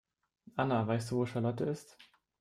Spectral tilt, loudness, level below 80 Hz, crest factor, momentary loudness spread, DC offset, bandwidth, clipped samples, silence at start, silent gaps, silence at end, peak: -7 dB/octave; -35 LUFS; -70 dBFS; 18 dB; 8 LU; under 0.1%; 13 kHz; under 0.1%; 0.55 s; none; 0.35 s; -18 dBFS